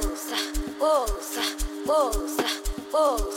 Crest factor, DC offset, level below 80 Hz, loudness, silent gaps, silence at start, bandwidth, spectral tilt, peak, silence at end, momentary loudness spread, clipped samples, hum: 14 dB; under 0.1%; -34 dBFS; -26 LUFS; none; 0 s; 17 kHz; -3 dB/octave; -12 dBFS; 0 s; 6 LU; under 0.1%; none